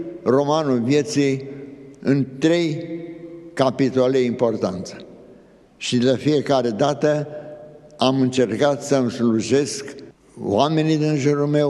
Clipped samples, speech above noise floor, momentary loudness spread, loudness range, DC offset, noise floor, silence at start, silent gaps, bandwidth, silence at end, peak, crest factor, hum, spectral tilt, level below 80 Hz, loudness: under 0.1%; 30 dB; 17 LU; 2 LU; under 0.1%; -49 dBFS; 0 s; none; 12 kHz; 0 s; -2 dBFS; 20 dB; none; -6 dB/octave; -62 dBFS; -20 LUFS